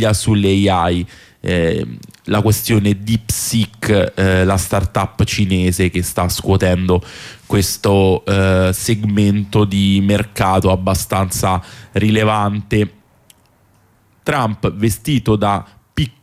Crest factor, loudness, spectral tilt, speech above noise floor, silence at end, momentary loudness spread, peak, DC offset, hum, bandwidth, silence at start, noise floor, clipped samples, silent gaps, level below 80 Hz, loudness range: 12 dB; -16 LUFS; -5.5 dB/octave; 39 dB; 0.15 s; 8 LU; -4 dBFS; under 0.1%; none; 16 kHz; 0 s; -54 dBFS; under 0.1%; none; -36 dBFS; 4 LU